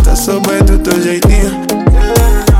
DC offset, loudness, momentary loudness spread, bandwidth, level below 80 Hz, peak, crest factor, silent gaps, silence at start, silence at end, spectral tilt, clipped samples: under 0.1%; -11 LUFS; 3 LU; 16.5 kHz; -10 dBFS; 0 dBFS; 8 dB; none; 0 s; 0 s; -5.5 dB/octave; under 0.1%